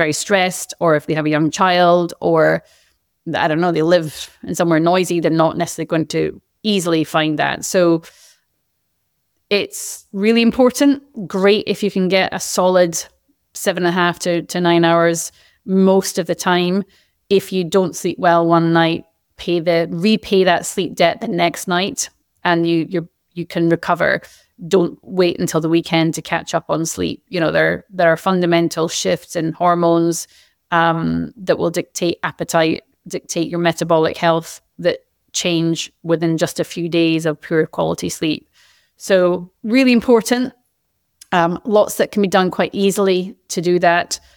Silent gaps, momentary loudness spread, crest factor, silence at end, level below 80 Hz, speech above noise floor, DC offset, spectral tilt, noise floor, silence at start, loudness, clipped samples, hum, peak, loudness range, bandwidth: none; 9 LU; 14 dB; 0.2 s; -56 dBFS; 53 dB; under 0.1%; -4.5 dB/octave; -69 dBFS; 0 s; -17 LUFS; under 0.1%; none; -2 dBFS; 3 LU; 19.5 kHz